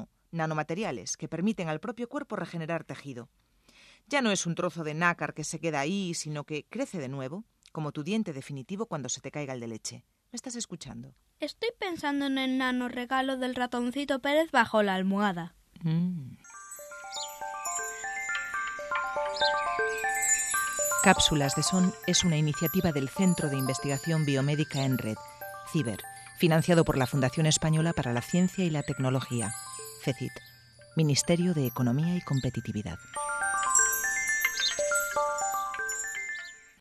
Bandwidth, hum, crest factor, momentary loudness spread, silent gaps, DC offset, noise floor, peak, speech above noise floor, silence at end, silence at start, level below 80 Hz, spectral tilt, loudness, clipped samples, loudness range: 13.5 kHz; none; 24 dB; 14 LU; none; under 0.1%; -59 dBFS; -6 dBFS; 30 dB; 0.2 s; 0 s; -58 dBFS; -4 dB/octave; -29 LUFS; under 0.1%; 10 LU